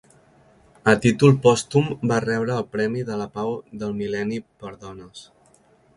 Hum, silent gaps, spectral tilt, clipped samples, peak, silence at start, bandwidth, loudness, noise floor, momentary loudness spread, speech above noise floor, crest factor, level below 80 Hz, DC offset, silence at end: none; none; -6 dB/octave; under 0.1%; -2 dBFS; 0.85 s; 11.5 kHz; -21 LUFS; -57 dBFS; 22 LU; 36 dB; 20 dB; -56 dBFS; under 0.1%; 0.75 s